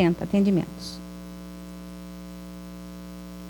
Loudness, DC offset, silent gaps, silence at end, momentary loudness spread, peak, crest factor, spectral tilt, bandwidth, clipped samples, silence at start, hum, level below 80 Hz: -25 LUFS; under 0.1%; none; 0 s; 18 LU; -12 dBFS; 18 dB; -7 dB/octave; 17.5 kHz; under 0.1%; 0 s; 60 Hz at -40 dBFS; -48 dBFS